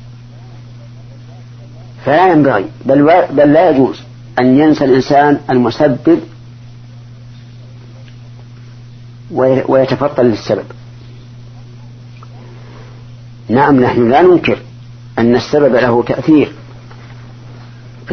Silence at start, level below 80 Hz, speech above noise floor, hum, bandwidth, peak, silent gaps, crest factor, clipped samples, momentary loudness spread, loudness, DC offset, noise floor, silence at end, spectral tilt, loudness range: 0 s; -44 dBFS; 23 dB; none; 6.6 kHz; 0 dBFS; none; 14 dB; under 0.1%; 25 LU; -11 LUFS; under 0.1%; -33 dBFS; 0 s; -7.5 dB/octave; 9 LU